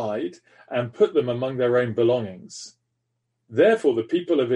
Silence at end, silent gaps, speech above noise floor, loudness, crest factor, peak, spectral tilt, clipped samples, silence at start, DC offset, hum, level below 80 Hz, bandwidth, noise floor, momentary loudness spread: 0 s; none; 54 dB; -22 LUFS; 16 dB; -6 dBFS; -6.5 dB/octave; under 0.1%; 0 s; under 0.1%; none; -68 dBFS; 10.5 kHz; -77 dBFS; 17 LU